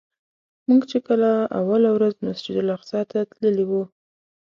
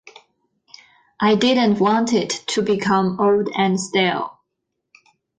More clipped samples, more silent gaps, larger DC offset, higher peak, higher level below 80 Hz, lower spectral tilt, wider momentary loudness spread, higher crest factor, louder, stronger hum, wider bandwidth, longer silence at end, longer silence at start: neither; neither; neither; about the same, -8 dBFS vs -6 dBFS; second, -68 dBFS vs -62 dBFS; first, -8 dB/octave vs -4.5 dB/octave; first, 8 LU vs 5 LU; about the same, 14 dB vs 14 dB; second, -21 LUFS vs -18 LUFS; neither; second, 7.2 kHz vs 9.8 kHz; second, 0.55 s vs 1.1 s; second, 0.7 s vs 1.2 s